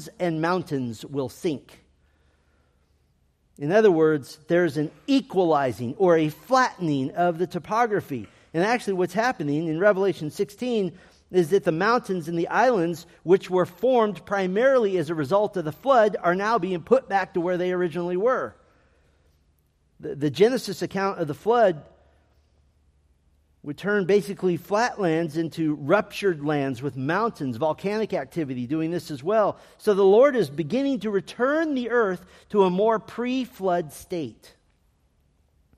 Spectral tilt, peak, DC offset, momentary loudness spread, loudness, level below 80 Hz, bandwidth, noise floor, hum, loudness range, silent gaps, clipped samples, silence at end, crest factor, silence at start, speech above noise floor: -6.5 dB/octave; -6 dBFS; under 0.1%; 9 LU; -24 LUFS; -64 dBFS; 15 kHz; -65 dBFS; none; 5 LU; none; under 0.1%; 1.45 s; 18 dB; 0 s; 42 dB